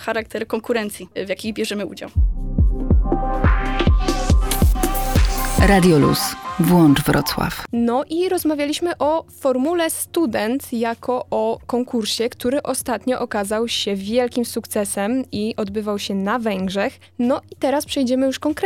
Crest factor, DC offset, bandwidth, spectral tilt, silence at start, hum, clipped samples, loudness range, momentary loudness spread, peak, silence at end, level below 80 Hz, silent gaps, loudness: 14 dB; under 0.1%; over 20 kHz; -5.5 dB/octave; 0 s; none; under 0.1%; 5 LU; 8 LU; -4 dBFS; 0 s; -26 dBFS; none; -20 LUFS